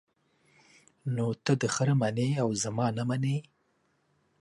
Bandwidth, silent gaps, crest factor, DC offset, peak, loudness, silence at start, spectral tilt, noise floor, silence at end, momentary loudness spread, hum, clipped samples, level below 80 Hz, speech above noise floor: 11.5 kHz; none; 18 dB; under 0.1%; -12 dBFS; -29 LUFS; 1.05 s; -5.5 dB/octave; -72 dBFS; 1 s; 7 LU; none; under 0.1%; -68 dBFS; 44 dB